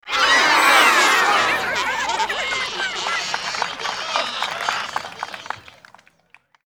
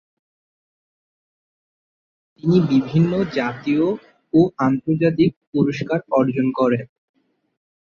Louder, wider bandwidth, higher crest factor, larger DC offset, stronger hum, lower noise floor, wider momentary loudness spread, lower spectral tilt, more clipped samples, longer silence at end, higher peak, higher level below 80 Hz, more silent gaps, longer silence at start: about the same, -18 LUFS vs -19 LUFS; first, over 20 kHz vs 7 kHz; about the same, 20 dB vs 16 dB; neither; neither; second, -56 dBFS vs under -90 dBFS; first, 17 LU vs 6 LU; second, 0 dB/octave vs -8.5 dB/octave; neither; about the same, 1.05 s vs 1.1 s; first, 0 dBFS vs -4 dBFS; about the same, -58 dBFS vs -56 dBFS; second, none vs 5.36-5.41 s, 5.47-5.52 s; second, 0.05 s vs 2.45 s